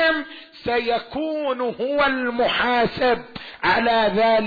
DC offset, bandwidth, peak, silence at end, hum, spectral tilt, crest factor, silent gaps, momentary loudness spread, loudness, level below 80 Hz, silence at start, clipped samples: under 0.1%; 4.9 kHz; -8 dBFS; 0 s; none; -6.5 dB/octave; 12 dB; none; 9 LU; -21 LUFS; -50 dBFS; 0 s; under 0.1%